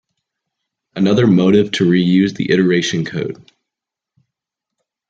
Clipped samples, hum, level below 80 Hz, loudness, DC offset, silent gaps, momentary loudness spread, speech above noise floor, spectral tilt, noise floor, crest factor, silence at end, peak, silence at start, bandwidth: under 0.1%; none; -56 dBFS; -14 LUFS; under 0.1%; none; 13 LU; 70 dB; -6.5 dB/octave; -84 dBFS; 14 dB; 1.75 s; -2 dBFS; 0.95 s; 7.8 kHz